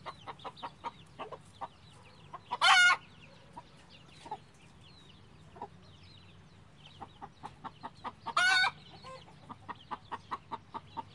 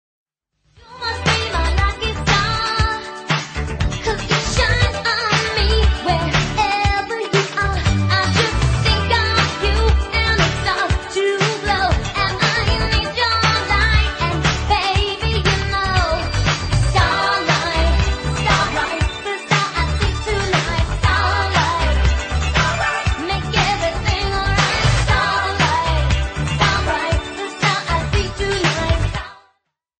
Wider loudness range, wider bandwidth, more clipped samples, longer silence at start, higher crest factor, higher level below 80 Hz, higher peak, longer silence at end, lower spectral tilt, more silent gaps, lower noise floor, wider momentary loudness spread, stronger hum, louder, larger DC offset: first, 21 LU vs 2 LU; first, 11.5 kHz vs 9.4 kHz; neither; second, 0.05 s vs 0.9 s; first, 26 dB vs 16 dB; second, -70 dBFS vs -24 dBFS; second, -12 dBFS vs -2 dBFS; second, 0.15 s vs 0.65 s; second, -0.5 dB/octave vs -4.5 dB/octave; neither; second, -58 dBFS vs -67 dBFS; first, 26 LU vs 5 LU; neither; second, -29 LUFS vs -18 LUFS; neither